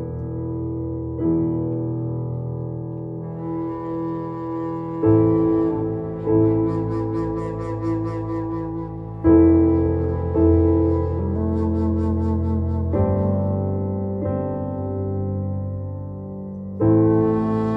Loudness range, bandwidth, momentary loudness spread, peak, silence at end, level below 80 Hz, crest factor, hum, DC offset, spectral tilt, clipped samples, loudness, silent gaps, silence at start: 7 LU; 2.8 kHz; 12 LU; -4 dBFS; 0 s; -36 dBFS; 16 dB; none; under 0.1%; -12 dB/octave; under 0.1%; -22 LUFS; none; 0 s